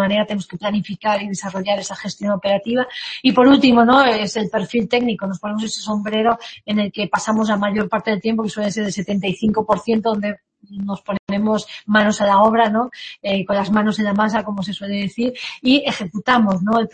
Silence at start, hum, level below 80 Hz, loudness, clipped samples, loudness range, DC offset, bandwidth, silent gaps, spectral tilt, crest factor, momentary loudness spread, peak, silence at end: 0 s; none; -54 dBFS; -18 LUFS; under 0.1%; 5 LU; under 0.1%; 8.8 kHz; 11.19-11.27 s; -5 dB/octave; 18 dB; 11 LU; 0 dBFS; 0 s